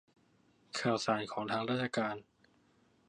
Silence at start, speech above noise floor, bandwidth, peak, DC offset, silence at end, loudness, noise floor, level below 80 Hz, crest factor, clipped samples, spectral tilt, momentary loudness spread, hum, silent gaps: 0.75 s; 35 dB; 11 kHz; -18 dBFS; under 0.1%; 0.85 s; -35 LUFS; -70 dBFS; -76 dBFS; 20 dB; under 0.1%; -4.5 dB/octave; 7 LU; none; none